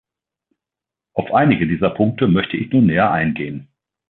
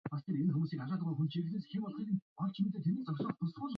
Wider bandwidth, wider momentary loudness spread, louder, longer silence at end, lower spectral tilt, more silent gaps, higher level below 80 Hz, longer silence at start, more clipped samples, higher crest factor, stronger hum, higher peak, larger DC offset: second, 4.2 kHz vs 5.4 kHz; first, 12 LU vs 5 LU; first, -17 LUFS vs -37 LUFS; first, 0.45 s vs 0 s; first, -11 dB/octave vs -8 dB/octave; second, none vs 2.22-2.36 s; first, -46 dBFS vs -78 dBFS; first, 1.15 s vs 0.05 s; neither; about the same, 16 dB vs 12 dB; neither; first, -2 dBFS vs -24 dBFS; neither